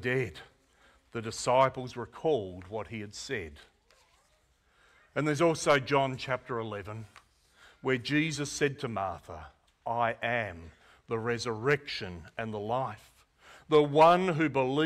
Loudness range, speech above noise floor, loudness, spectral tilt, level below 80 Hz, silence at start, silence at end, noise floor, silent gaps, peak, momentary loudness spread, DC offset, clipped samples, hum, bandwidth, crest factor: 6 LU; 39 dB; -30 LUFS; -5 dB/octave; -62 dBFS; 0 s; 0 s; -69 dBFS; none; -12 dBFS; 15 LU; under 0.1%; under 0.1%; none; 14.5 kHz; 18 dB